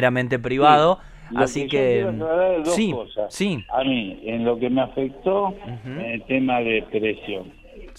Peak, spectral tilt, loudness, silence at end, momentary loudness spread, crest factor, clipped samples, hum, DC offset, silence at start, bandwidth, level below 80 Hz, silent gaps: -2 dBFS; -5.5 dB/octave; -22 LUFS; 0 s; 12 LU; 20 dB; under 0.1%; none; under 0.1%; 0 s; 13.5 kHz; -48 dBFS; none